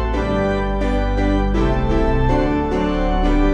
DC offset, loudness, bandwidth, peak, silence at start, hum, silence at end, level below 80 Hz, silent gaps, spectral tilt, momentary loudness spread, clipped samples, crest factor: under 0.1%; -19 LUFS; 8.2 kHz; -4 dBFS; 0 s; none; 0 s; -20 dBFS; none; -8 dB/octave; 2 LU; under 0.1%; 12 dB